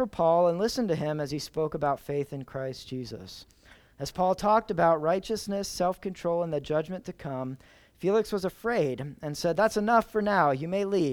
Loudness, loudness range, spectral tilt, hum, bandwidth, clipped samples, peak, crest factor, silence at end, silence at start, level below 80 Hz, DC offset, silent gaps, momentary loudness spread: -28 LUFS; 5 LU; -5.5 dB/octave; none; 19.5 kHz; under 0.1%; -10 dBFS; 18 dB; 0 s; 0 s; -56 dBFS; under 0.1%; none; 14 LU